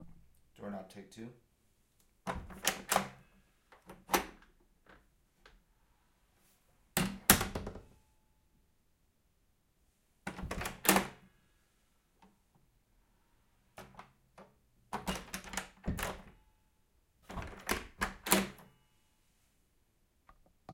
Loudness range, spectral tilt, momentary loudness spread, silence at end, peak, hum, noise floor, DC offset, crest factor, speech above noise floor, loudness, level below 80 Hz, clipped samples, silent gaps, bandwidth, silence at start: 9 LU; -2.5 dB/octave; 22 LU; 0 s; -6 dBFS; none; -74 dBFS; under 0.1%; 36 dB; 35 dB; -35 LUFS; -56 dBFS; under 0.1%; none; 16.5 kHz; 0 s